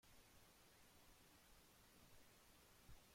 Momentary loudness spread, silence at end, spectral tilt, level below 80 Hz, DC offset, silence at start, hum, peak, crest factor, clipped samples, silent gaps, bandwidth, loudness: 1 LU; 0 s; -3 dB/octave; -76 dBFS; under 0.1%; 0 s; none; -52 dBFS; 18 dB; under 0.1%; none; 16.5 kHz; -70 LUFS